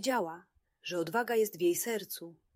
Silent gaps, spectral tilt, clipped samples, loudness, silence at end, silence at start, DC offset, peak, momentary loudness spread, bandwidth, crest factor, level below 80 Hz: none; -3.5 dB/octave; under 0.1%; -33 LUFS; 0.2 s; 0 s; under 0.1%; -18 dBFS; 13 LU; 16 kHz; 16 dB; -80 dBFS